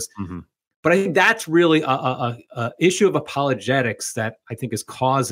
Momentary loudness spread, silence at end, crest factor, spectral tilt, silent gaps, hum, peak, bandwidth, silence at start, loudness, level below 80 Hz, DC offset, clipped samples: 13 LU; 0 s; 18 dB; -4.5 dB/octave; 0.76-0.83 s; none; -2 dBFS; 16 kHz; 0 s; -20 LUFS; -60 dBFS; under 0.1%; under 0.1%